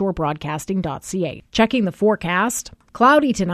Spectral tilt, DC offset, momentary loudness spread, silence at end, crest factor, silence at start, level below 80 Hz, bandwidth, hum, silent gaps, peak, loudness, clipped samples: -5 dB/octave; under 0.1%; 11 LU; 0 s; 16 dB; 0 s; -46 dBFS; 14 kHz; none; none; -2 dBFS; -19 LUFS; under 0.1%